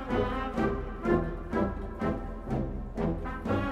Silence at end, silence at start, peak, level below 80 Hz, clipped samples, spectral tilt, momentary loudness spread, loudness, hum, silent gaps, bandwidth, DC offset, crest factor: 0 s; 0 s; -14 dBFS; -38 dBFS; under 0.1%; -8.5 dB/octave; 6 LU; -32 LUFS; none; none; 10 kHz; under 0.1%; 18 dB